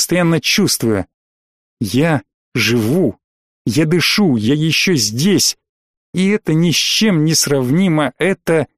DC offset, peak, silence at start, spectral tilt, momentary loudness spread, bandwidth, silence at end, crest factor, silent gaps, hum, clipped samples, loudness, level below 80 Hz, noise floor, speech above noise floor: 0.3%; -4 dBFS; 0 s; -4 dB/octave; 8 LU; 15.5 kHz; 0.1 s; 12 dB; 1.14-1.77 s, 2.34-2.52 s, 3.24-3.65 s, 5.69-6.13 s; none; under 0.1%; -14 LUFS; -50 dBFS; under -90 dBFS; over 76 dB